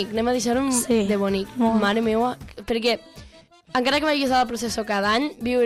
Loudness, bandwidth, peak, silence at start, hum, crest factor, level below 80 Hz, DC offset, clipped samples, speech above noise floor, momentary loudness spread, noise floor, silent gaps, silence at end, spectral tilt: -22 LUFS; 15.5 kHz; -10 dBFS; 0 s; none; 14 dB; -48 dBFS; under 0.1%; under 0.1%; 28 dB; 7 LU; -49 dBFS; none; 0 s; -4 dB/octave